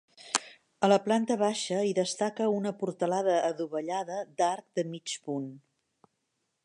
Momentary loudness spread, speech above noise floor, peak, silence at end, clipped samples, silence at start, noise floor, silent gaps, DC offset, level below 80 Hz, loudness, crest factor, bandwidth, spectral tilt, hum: 9 LU; 51 dB; -6 dBFS; 1.05 s; under 0.1%; 0.2 s; -80 dBFS; none; under 0.1%; -84 dBFS; -30 LUFS; 24 dB; 11.5 kHz; -4 dB/octave; none